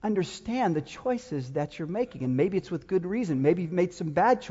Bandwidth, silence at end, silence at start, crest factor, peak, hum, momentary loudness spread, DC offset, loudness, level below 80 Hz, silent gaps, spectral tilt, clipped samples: 8 kHz; 0 s; 0 s; 16 dB; -10 dBFS; none; 7 LU; under 0.1%; -28 LUFS; -60 dBFS; none; -7 dB/octave; under 0.1%